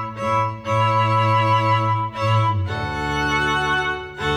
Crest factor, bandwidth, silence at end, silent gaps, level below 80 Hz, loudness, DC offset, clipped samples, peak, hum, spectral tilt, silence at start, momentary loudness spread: 12 dB; 11 kHz; 0 s; none; -42 dBFS; -20 LUFS; under 0.1%; under 0.1%; -8 dBFS; none; -5.5 dB/octave; 0 s; 6 LU